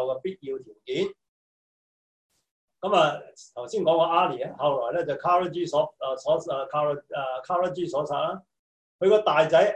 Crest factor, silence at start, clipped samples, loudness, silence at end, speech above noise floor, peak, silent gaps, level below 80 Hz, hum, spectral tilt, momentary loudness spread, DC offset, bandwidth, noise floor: 18 dB; 0 s; under 0.1%; -25 LUFS; 0 s; over 65 dB; -8 dBFS; 1.29-2.30 s, 2.51-2.68 s, 8.59-8.99 s; -68 dBFS; none; -5.5 dB/octave; 13 LU; under 0.1%; 9 kHz; under -90 dBFS